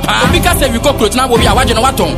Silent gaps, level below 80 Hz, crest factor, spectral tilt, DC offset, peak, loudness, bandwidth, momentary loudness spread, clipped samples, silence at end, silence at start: none; -20 dBFS; 10 dB; -4 dB/octave; under 0.1%; 0 dBFS; -10 LUFS; 16 kHz; 2 LU; 0.2%; 0 s; 0 s